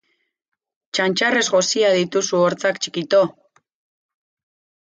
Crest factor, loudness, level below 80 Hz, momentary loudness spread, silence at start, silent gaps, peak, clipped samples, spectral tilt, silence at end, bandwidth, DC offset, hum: 16 dB; -18 LUFS; -70 dBFS; 6 LU; 0.95 s; none; -4 dBFS; under 0.1%; -3 dB/octave; 1.65 s; 9.6 kHz; under 0.1%; none